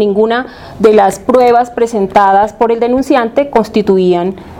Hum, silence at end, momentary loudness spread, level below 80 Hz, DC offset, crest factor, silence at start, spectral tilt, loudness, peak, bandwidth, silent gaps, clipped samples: none; 0 s; 6 LU; -42 dBFS; under 0.1%; 10 dB; 0 s; -6 dB/octave; -10 LUFS; 0 dBFS; 15.5 kHz; none; 0.5%